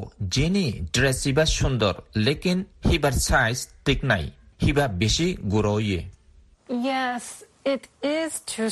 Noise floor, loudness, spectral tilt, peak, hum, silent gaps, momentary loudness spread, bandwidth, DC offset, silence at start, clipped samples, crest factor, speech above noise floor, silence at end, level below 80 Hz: -55 dBFS; -24 LUFS; -4.5 dB/octave; -6 dBFS; none; none; 7 LU; 12.5 kHz; under 0.1%; 0 s; under 0.1%; 18 dB; 31 dB; 0 s; -36 dBFS